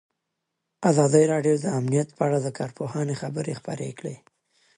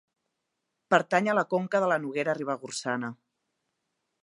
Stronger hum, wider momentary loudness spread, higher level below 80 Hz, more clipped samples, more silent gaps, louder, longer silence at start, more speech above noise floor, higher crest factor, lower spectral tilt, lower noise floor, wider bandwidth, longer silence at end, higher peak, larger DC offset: neither; first, 14 LU vs 8 LU; first, -68 dBFS vs -82 dBFS; neither; neither; first, -24 LUFS vs -27 LUFS; about the same, 0.8 s vs 0.9 s; about the same, 57 dB vs 55 dB; about the same, 20 dB vs 24 dB; first, -6.5 dB/octave vs -5 dB/octave; about the same, -81 dBFS vs -82 dBFS; about the same, 11.5 kHz vs 11.5 kHz; second, 0.6 s vs 1.1 s; about the same, -4 dBFS vs -6 dBFS; neither